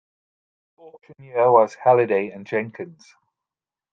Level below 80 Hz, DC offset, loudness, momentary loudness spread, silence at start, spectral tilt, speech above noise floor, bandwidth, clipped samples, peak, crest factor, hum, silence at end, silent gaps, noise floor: -74 dBFS; under 0.1%; -20 LUFS; 18 LU; 1.35 s; -7.5 dB/octave; 69 dB; 7.4 kHz; under 0.1%; -2 dBFS; 22 dB; none; 1.05 s; none; -90 dBFS